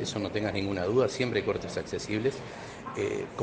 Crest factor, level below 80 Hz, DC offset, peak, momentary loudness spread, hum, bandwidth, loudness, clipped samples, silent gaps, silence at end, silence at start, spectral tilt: 18 dB; -58 dBFS; under 0.1%; -12 dBFS; 12 LU; none; 9.6 kHz; -31 LUFS; under 0.1%; none; 0 s; 0 s; -5.5 dB/octave